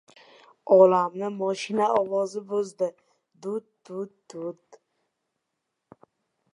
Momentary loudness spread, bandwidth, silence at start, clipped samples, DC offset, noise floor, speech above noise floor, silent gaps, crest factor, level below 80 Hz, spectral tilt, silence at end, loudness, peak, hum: 20 LU; 10.5 kHz; 0.65 s; under 0.1%; under 0.1%; -81 dBFS; 57 dB; none; 22 dB; -80 dBFS; -6 dB/octave; 2 s; -24 LUFS; -6 dBFS; none